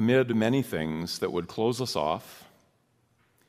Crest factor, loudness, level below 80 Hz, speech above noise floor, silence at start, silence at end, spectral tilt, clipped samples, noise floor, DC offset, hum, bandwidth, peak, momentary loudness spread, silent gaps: 18 dB; -28 LUFS; -60 dBFS; 41 dB; 0 s; 1.05 s; -5.5 dB/octave; under 0.1%; -69 dBFS; under 0.1%; none; 15.5 kHz; -12 dBFS; 8 LU; none